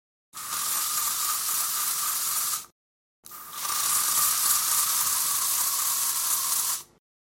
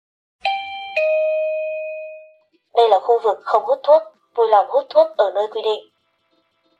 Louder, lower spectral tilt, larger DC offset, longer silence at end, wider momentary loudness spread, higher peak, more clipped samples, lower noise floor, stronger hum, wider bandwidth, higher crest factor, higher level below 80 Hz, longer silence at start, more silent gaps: second, -24 LUFS vs -18 LUFS; second, 2.5 dB/octave vs -2.5 dB/octave; neither; second, 0.55 s vs 1 s; about the same, 11 LU vs 12 LU; second, -8 dBFS vs -2 dBFS; neither; first, under -90 dBFS vs -65 dBFS; neither; first, 17 kHz vs 7.8 kHz; about the same, 20 dB vs 16 dB; first, -70 dBFS vs -76 dBFS; about the same, 0.35 s vs 0.45 s; first, 2.72-3.23 s vs none